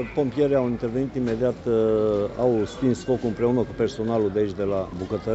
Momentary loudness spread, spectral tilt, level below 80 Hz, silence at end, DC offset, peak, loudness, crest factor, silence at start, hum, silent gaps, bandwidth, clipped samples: 5 LU; -7.5 dB/octave; -46 dBFS; 0 s; under 0.1%; -8 dBFS; -24 LUFS; 16 dB; 0 s; none; none; 8.2 kHz; under 0.1%